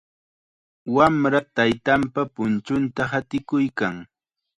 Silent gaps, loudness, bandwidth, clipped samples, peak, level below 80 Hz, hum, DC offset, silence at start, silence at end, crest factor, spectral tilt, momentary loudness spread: none; -22 LUFS; 10.5 kHz; under 0.1%; -4 dBFS; -54 dBFS; none; under 0.1%; 0.85 s; 0.55 s; 20 dB; -6.5 dB/octave; 9 LU